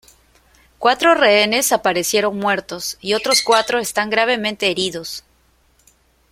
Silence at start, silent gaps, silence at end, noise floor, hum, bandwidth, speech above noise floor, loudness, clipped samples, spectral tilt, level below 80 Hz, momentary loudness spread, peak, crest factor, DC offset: 0.8 s; none; 1.1 s; -58 dBFS; none; 16.5 kHz; 40 dB; -16 LUFS; under 0.1%; -2 dB/octave; -56 dBFS; 11 LU; 0 dBFS; 18 dB; under 0.1%